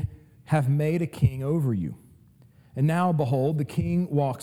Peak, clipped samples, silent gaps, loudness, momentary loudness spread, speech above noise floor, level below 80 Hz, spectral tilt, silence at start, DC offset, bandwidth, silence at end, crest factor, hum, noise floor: -8 dBFS; under 0.1%; none; -26 LUFS; 6 LU; 31 dB; -48 dBFS; -8.5 dB/octave; 0 s; under 0.1%; 13.5 kHz; 0 s; 16 dB; none; -55 dBFS